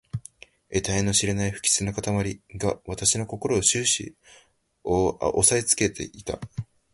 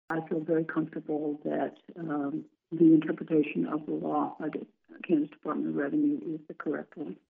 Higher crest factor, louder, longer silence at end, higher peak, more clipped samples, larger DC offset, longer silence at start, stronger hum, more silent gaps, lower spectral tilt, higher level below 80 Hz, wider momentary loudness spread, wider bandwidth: about the same, 22 dB vs 18 dB; first, -24 LUFS vs -30 LUFS; first, 0.3 s vs 0.15 s; first, -4 dBFS vs -12 dBFS; neither; neither; about the same, 0.15 s vs 0.1 s; neither; neither; second, -3 dB/octave vs -7.5 dB/octave; first, -46 dBFS vs -82 dBFS; about the same, 15 LU vs 15 LU; first, 11.5 kHz vs 3.7 kHz